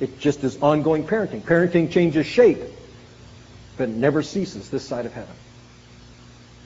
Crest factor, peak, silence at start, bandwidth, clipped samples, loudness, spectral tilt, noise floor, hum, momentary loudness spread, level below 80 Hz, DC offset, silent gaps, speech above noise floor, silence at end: 20 dB; -2 dBFS; 0 s; 8 kHz; under 0.1%; -21 LUFS; -6 dB/octave; -46 dBFS; 60 Hz at -50 dBFS; 15 LU; -52 dBFS; under 0.1%; none; 26 dB; 1.3 s